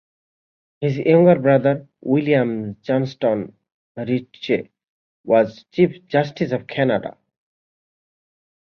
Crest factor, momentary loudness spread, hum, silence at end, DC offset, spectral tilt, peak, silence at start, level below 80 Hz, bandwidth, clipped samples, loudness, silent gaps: 18 dB; 12 LU; none; 1.5 s; under 0.1%; -8.5 dB/octave; -2 dBFS; 0.8 s; -62 dBFS; 6.6 kHz; under 0.1%; -19 LUFS; 3.74-3.95 s, 4.88-5.24 s